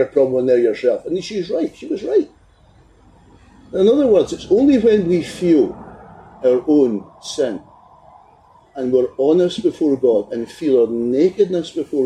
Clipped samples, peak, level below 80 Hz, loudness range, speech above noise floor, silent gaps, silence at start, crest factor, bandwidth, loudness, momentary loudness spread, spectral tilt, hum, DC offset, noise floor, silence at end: under 0.1%; -4 dBFS; -52 dBFS; 5 LU; 34 dB; none; 0 s; 14 dB; 11 kHz; -17 LUFS; 11 LU; -6.5 dB/octave; none; under 0.1%; -50 dBFS; 0 s